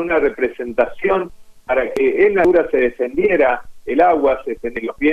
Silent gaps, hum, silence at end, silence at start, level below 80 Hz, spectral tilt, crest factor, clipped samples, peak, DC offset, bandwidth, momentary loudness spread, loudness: none; none; 0 s; 0 s; -42 dBFS; -7 dB/octave; 14 dB; under 0.1%; -2 dBFS; under 0.1%; 8.2 kHz; 9 LU; -17 LUFS